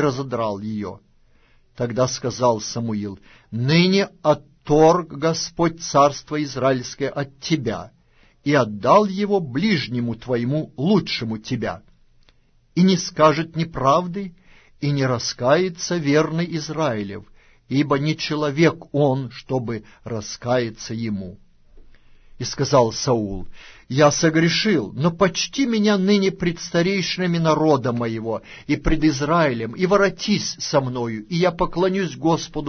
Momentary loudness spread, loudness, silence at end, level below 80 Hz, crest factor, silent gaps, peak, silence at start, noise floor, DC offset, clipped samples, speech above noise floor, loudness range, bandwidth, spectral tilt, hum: 11 LU; -21 LUFS; 0 s; -42 dBFS; 18 dB; none; -2 dBFS; 0 s; -56 dBFS; under 0.1%; under 0.1%; 36 dB; 5 LU; 6.6 kHz; -5.5 dB/octave; none